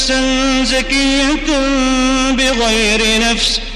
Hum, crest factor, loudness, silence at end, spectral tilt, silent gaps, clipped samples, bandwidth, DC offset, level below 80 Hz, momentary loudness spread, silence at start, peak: none; 12 dB; -13 LUFS; 0 s; -2 dB/octave; none; under 0.1%; 13 kHz; under 0.1%; -26 dBFS; 2 LU; 0 s; -2 dBFS